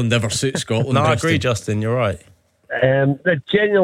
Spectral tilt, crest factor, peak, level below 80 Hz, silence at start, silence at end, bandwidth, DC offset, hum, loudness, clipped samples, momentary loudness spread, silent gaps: -5 dB/octave; 14 dB; -4 dBFS; -50 dBFS; 0 s; 0 s; 15 kHz; under 0.1%; none; -19 LUFS; under 0.1%; 5 LU; none